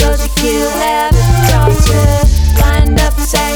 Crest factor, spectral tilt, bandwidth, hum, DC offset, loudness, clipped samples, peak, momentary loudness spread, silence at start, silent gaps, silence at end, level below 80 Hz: 10 dB; -5 dB/octave; over 20 kHz; none; under 0.1%; -11 LUFS; under 0.1%; 0 dBFS; 3 LU; 0 s; none; 0 s; -12 dBFS